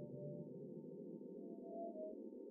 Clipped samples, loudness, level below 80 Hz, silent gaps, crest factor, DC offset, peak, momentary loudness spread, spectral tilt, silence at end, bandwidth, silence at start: under 0.1%; -52 LUFS; under -90 dBFS; none; 12 dB; under 0.1%; -38 dBFS; 4 LU; -4.5 dB/octave; 0 s; 1.5 kHz; 0 s